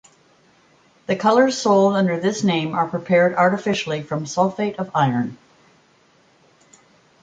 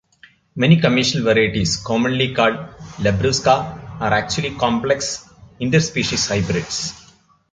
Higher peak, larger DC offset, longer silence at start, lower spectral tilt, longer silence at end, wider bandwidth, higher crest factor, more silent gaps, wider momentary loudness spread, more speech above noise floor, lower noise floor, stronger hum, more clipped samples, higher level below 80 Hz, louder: about the same, -4 dBFS vs -2 dBFS; neither; first, 1.1 s vs 0.55 s; about the same, -5.5 dB/octave vs -4.5 dB/octave; first, 1.85 s vs 0.5 s; about the same, 9.2 kHz vs 9.4 kHz; about the same, 18 dB vs 18 dB; neither; about the same, 9 LU vs 10 LU; first, 38 dB vs 34 dB; first, -57 dBFS vs -52 dBFS; neither; neither; second, -64 dBFS vs -42 dBFS; about the same, -19 LUFS vs -18 LUFS